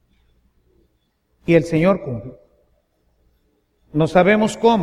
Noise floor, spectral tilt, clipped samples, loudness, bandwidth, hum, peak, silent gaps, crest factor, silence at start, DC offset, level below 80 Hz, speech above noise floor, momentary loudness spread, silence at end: -66 dBFS; -6.5 dB/octave; under 0.1%; -17 LUFS; 12 kHz; none; -2 dBFS; none; 18 dB; 1.5 s; under 0.1%; -50 dBFS; 50 dB; 17 LU; 0 s